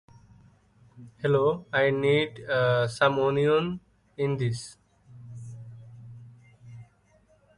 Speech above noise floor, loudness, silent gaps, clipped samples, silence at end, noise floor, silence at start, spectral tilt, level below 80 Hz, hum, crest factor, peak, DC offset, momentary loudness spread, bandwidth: 38 dB; -25 LUFS; none; under 0.1%; 0.75 s; -63 dBFS; 0.95 s; -6 dB/octave; -62 dBFS; none; 20 dB; -8 dBFS; under 0.1%; 23 LU; 11.5 kHz